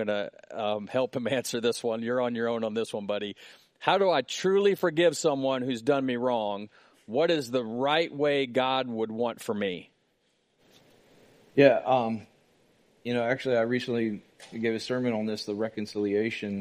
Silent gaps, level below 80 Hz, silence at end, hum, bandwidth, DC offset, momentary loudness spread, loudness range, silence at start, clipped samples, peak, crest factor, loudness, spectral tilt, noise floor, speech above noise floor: none; -76 dBFS; 0 s; none; 15 kHz; under 0.1%; 9 LU; 4 LU; 0 s; under 0.1%; -6 dBFS; 22 dB; -28 LUFS; -5 dB/octave; -71 dBFS; 44 dB